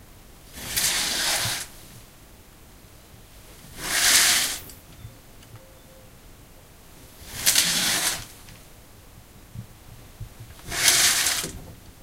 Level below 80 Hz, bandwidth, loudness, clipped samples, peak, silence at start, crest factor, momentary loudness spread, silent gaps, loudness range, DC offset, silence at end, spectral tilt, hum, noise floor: -50 dBFS; 16 kHz; -20 LUFS; under 0.1%; 0 dBFS; 0 s; 28 dB; 27 LU; none; 4 LU; under 0.1%; 0.1 s; 0.5 dB/octave; none; -49 dBFS